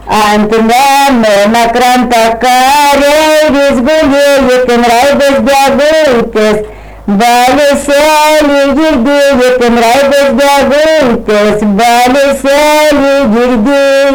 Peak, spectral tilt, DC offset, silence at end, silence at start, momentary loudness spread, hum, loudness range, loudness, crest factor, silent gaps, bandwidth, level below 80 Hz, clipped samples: -4 dBFS; -4 dB/octave; under 0.1%; 0 s; 0 s; 3 LU; none; 1 LU; -6 LUFS; 2 dB; none; over 20 kHz; -32 dBFS; under 0.1%